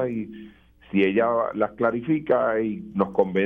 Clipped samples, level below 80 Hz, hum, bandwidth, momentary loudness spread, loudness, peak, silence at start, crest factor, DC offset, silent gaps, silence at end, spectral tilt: under 0.1%; -58 dBFS; none; 4.3 kHz; 8 LU; -24 LUFS; -4 dBFS; 0 s; 18 dB; under 0.1%; none; 0 s; -9.5 dB/octave